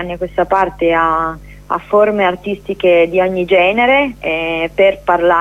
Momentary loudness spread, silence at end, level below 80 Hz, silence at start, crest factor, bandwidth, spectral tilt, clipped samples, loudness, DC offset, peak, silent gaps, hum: 11 LU; 0 s; -40 dBFS; 0 s; 12 dB; 12.5 kHz; -6.5 dB/octave; under 0.1%; -14 LUFS; under 0.1%; 0 dBFS; none; 50 Hz at -40 dBFS